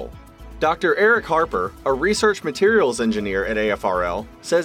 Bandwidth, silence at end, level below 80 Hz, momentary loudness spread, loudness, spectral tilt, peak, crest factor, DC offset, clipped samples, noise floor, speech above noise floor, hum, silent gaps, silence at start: 15 kHz; 0 s; -42 dBFS; 7 LU; -20 LUFS; -4 dB/octave; -6 dBFS; 14 dB; under 0.1%; under 0.1%; -39 dBFS; 20 dB; none; none; 0 s